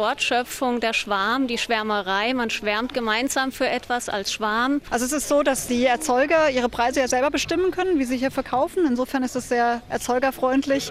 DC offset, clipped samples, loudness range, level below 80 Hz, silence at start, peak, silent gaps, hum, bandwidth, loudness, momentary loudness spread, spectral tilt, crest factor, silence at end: under 0.1%; under 0.1%; 2 LU; -50 dBFS; 0 s; -8 dBFS; none; none; 16 kHz; -22 LUFS; 4 LU; -2.5 dB/octave; 14 dB; 0 s